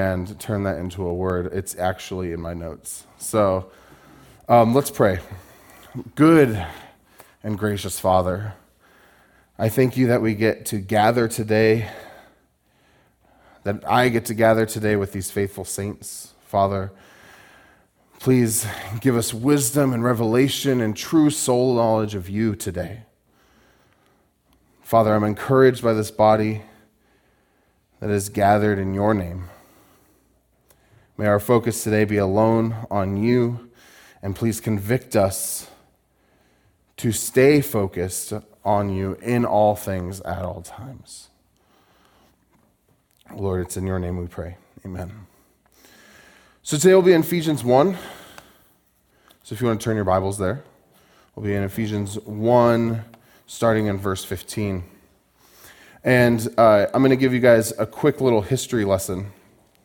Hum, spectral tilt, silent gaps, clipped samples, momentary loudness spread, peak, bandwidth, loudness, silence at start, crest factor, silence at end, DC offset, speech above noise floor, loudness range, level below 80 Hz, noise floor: none; -5.5 dB/octave; none; under 0.1%; 17 LU; -2 dBFS; 18 kHz; -21 LUFS; 0 s; 20 dB; 0.55 s; under 0.1%; 43 dB; 7 LU; -54 dBFS; -63 dBFS